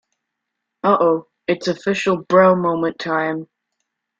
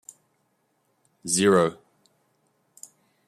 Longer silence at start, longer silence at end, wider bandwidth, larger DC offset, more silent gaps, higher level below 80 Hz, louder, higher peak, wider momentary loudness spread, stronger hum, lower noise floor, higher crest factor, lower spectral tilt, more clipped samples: second, 0.85 s vs 1.25 s; second, 0.75 s vs 1.55 s; second, 7.8 kHz vs 15 kHz; neither; neither; first, -62 dBFS vs -68 dBFS; first, -18 LUFS vs -22 LUFS; first, -2 dBFS vs -6 dBFS; second, 10 LU vs 27 LU; neither; first, -79 dBFS vs -71 dBFS; about the same, 18 dB vs 22 dB; first, -6 dB/octave vs -4 dB/octave; neither